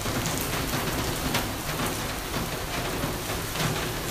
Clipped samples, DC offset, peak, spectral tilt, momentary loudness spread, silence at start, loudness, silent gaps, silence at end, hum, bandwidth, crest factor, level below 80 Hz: under 0.1%; under 0.1%; -10 dBFS; -3.5 dB/octave; 3 LU; 0 s; -28 LUFS; none; 0 s; none; 16 kHz; 18 dB; -40 dBFS